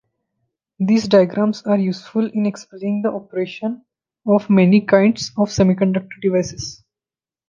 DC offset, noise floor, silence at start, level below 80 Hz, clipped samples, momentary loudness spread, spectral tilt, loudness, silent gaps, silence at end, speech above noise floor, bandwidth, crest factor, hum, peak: under 0.1%; under -90 dBFS; 0.8 s; -52 dBFS; under 0.1%; 14 LU; -6.5 dB/octave; -18 LUFS; none; 0.75 s; over 73 dB; 7.4 kHz; 16 dB; none; -2 dBFS